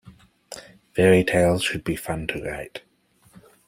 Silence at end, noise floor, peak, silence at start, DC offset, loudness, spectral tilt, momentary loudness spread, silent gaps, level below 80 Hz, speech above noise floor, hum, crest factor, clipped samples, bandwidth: 0.9 s; -60 dBFS; -4 dBFS; 0.05 s; under 0.1%; -22 LUFS; -5.5 dB/octave; 23 LU; none; -50 dBFS; 39 dB; none; 22 dB; under 0.1%; 16 kHz